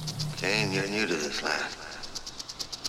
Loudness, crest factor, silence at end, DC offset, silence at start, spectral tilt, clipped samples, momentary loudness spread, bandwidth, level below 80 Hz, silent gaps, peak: -30 LUFS; 22 dB; 0 s; under 0.1%; 0 s; -3.5 dB/octave; under 0.1%; 11 LU; 16 kHz; -54 dBFS; none; -10 dBFS